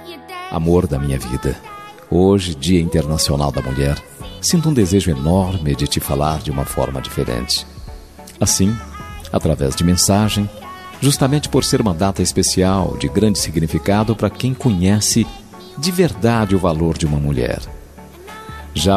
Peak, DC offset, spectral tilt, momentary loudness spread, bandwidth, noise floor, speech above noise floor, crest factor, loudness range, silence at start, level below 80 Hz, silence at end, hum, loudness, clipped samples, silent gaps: -2 dBFS; 0.1%; -5 dB/octave; 17 LU; 15 kHz; -38 dBFS; 21 dB; 16 dB; 3 LU; 0 s; -32 dBFS; 0 s; none; -17 LUFS; under 0.1%; none